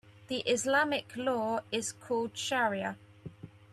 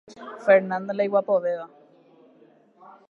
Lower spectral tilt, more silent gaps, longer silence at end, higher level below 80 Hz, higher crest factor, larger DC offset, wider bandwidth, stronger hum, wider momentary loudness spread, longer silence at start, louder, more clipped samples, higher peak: second, -3 dB/octave vs -7 dB/octave; neither; second, 0.25 s vs 1.45 s; first, -72 dBFS vs -80 dBFS; about the same, 18 dB vs 20 dB; neither; first, 14 kHz vs 6.8 kHz; neither; about the same, 18 LU vs 17 LU; about the same, 0.05 s vs 0.1 s; second, -32 LUFS vs -23 LUFS; neither; second, -16 dBFS vs -6 dBFS